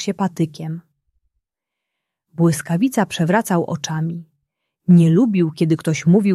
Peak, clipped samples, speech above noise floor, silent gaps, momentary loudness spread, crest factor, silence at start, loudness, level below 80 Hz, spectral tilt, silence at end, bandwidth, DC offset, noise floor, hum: -2 dBFS; under 0.1%; 66 dB; none; 15 LU; 16 dB; 0 s; -18 LUFS; -62 dBFS; -6.5 dB/octave; 0 s; 13.5 kHz; under 0.1%; -83 dBFS; none